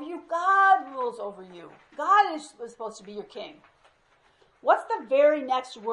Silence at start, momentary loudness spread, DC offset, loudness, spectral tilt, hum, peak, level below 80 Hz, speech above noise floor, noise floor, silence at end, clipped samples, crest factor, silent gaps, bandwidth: 0 s; 21 LU; under 0.1%; -24 LUFS; -3 dB/octave; none; -8 dBFS; -76 dBFS; 37 dB; -64 dBFS; 0 s; under 0.1%; 18 dB; none; 11 kHz